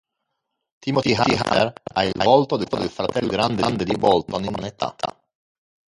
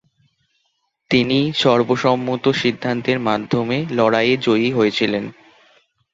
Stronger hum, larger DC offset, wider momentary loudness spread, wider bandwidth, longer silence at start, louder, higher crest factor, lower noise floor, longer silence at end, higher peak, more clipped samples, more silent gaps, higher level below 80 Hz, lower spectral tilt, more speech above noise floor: neither; neither; first, 10 LU vs 5 LU; first, 11.5 kHz vs 7.8 kHz; second, 0.85 s vs 1.1 s; second, -21 LUFS vs -18 LUFS; about the same, 20 dB vs 18 dB; first, -78 dBFS vs -69 dBFS; about the same, 0.8 s vs 0.8 s; about the same, -2 dBFS vs -2 dBFS; neither; neither; first, -50 dBFS vs -56 dBFS; about the same, -5.5 dB/octave vs -6 dB/octave; first, 58 dB vs 52 dB